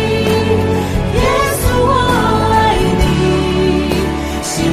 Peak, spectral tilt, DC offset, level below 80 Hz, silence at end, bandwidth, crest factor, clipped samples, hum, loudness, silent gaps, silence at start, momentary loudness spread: 0 dBFS; -5.5 dB/octave; under 0.1%; -22 dBFS; 0 s; 16 kHz; 12 dB; under 0.1%; none; -13 LUFS; none; 0 s; 5 LU